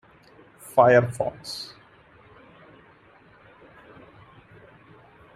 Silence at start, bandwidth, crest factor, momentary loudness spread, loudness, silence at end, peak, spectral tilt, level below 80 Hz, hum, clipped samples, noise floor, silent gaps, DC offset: 0.75 s; 15 kHz; 24 dB; 22 LU; -22 LUFS; 3.7 s; -2 dBFS; -5.5 dB/octave; -64 dBFS; none; under 0.1%; -54 dBFS; none; under 0.1%